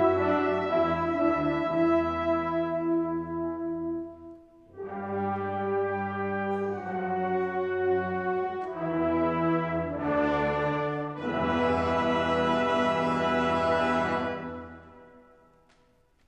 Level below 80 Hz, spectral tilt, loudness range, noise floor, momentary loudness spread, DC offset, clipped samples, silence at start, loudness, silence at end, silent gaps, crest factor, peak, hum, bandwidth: -54 dBFS; -7 dB/octave; 6 LU; -64 dBFS; 8 LU; under 0.1%; under 0.1%; 0 s; -28 LUFS; 1.1 s; none; 16 dB; -12 dBFS; none; 8.4 kHz